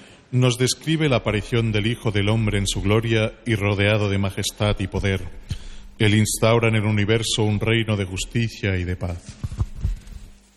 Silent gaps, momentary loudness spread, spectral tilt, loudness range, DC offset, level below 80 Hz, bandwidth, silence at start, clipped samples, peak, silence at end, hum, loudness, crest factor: none; 11 LU; -5 dB/octave; 2 LU; under 0.1%; -36 dBFS; 13 kHz; 0 s; under 0.1%; -6 dBFS; 0.2 s; none; -22 LUFS; 16 dB